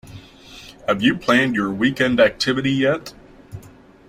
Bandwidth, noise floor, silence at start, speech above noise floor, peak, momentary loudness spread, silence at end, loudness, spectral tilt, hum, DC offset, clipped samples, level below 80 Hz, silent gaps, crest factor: 15.5 kHz; -45 dBFS; 0.05 s; 27 dB; -2 dBFS; 24 LU; 0.4 s; -18 LUFS; -5.5 dB/octave; none; under 0.1%; under 0.1%; -50 dBFS; none; 18 dB